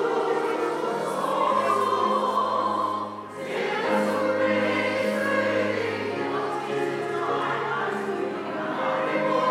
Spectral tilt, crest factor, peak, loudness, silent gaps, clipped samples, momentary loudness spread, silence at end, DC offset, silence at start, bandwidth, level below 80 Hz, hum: -5 dB/octave; 14 dB; -10 dBFS; -25 LUFS; none; under 0.1%; 6 LU; 0 s; under 0.1%; 0 s; 15.5 kHz; -78 dBFS; none